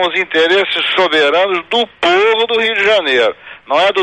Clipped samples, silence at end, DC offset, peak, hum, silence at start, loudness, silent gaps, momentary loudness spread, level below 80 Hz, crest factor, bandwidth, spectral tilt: under 0.1%; 0 s; under 0.1%; -2 dBFS; none; 0 s; -12 LUFS; none; 5 LU; -54 dBFS; 10 dB; 9.8 kHz; -3 dB/octave